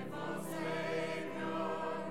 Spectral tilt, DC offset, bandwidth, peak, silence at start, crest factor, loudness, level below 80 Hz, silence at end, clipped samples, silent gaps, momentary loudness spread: -5.5 dB/octave; 0.3%; 16 kHz; -26 dBFS; 0 s; 12 dB; -39 LUFS; -72 dBFS; 0 s; under 0.1%; none; 4 LU